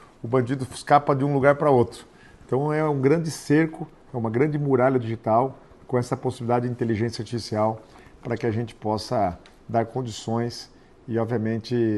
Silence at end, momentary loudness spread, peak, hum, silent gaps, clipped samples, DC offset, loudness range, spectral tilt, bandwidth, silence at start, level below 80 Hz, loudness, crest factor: 0 s; 10 LU; -2 dBFS; none; none; under 0.1%; under 0.1%; 6 LU; -7 dB/octave; 12.5 kHz; 0.25 s; -56 dBFS; -24 LUFS; 20 dB